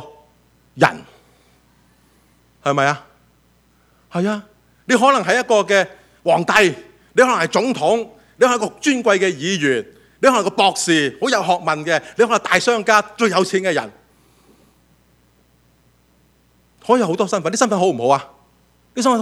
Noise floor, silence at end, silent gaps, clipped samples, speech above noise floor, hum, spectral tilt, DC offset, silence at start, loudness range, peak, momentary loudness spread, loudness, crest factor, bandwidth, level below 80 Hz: -57 dBFS; 0 s; none; under 0.1%; 40 dB; none; -3.5 dB/octave; under 0.1%; 0 s; 8 LU; 0 dBFS; 9 LU; -17 LUFS; 18 dB; 15.5 kHz; -60 dBFS